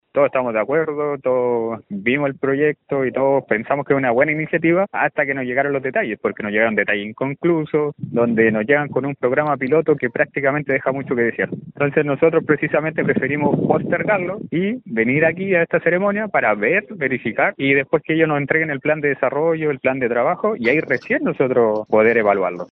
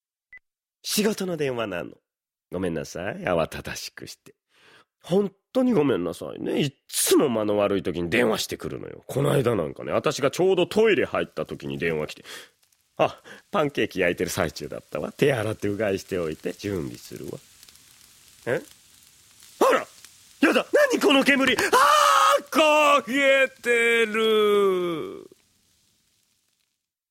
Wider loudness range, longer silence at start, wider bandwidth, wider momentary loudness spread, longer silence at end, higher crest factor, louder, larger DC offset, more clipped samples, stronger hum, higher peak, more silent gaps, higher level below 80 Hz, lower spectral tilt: second, 2 LU vs 11 LU; second, 0.15 s vs 0.35 s; second, 5.6 kHz vs 16.5 kHz; second, 5 LU vs 16 LU; second, 0.05 s vs 1.85 s; about the same, 18 dB vs 20 dB; first, -19 LUFS vs -23 LUFS; neither; neither; neither; first, 0 dBFS vs -4 dBFS; neither; about the same, -58 dBFS vs -58 dBFS; first, -5.5 dB/octave vs -4 dB/octave